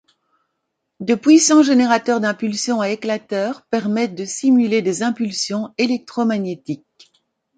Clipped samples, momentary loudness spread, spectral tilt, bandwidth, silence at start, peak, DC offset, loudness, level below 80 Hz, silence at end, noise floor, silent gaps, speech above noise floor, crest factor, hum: under 0.1%; 11 LU; -4 dB/octave; 9.4 kHz; 1 s; -2 dBFS; under 0.1%; -18 LUFS; -68 dBFS; 0.8 s; -75 dBFS; none; 58 dB; 16 dB; none